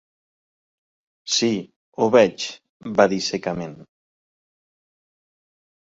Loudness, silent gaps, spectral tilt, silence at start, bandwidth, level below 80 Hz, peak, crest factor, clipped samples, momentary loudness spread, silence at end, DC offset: -21 LUFS; 1.76-1.92 s, 2.69-2.80 s; -4 dB/octave; 1.25 s; 8 kHz; -62 dBFS; -2 dBFS; 22 dB; under 0.1%; 20 LU; 2.1 s; under 0.1%